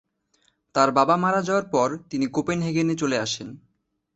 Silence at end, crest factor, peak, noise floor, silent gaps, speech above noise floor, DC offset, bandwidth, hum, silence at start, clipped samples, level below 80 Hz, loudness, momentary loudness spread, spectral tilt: 0.6 s; 20 dB; -4 dBFS; -72 dBFS; none; 49 dB; under 0.1%; 8.2 kHz; none; 0.75 s; under 0.1%; -60 dBFS; -23 LUFS; 9 LU; -5 dB/octave